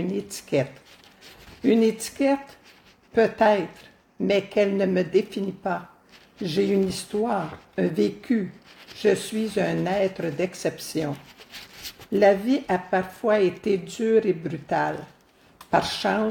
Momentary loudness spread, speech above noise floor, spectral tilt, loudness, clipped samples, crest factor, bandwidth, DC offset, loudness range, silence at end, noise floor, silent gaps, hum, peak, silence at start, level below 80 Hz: 12 LU; 30 dB; -5.5 dB/octave; -24 LUFS; under 0.1%; 18 dB; 17.5 kHz; under 0.1%; 3 LU; 0 s; -54 dBFS; none; none; -6 dBFS; 0 s; -60 dBFS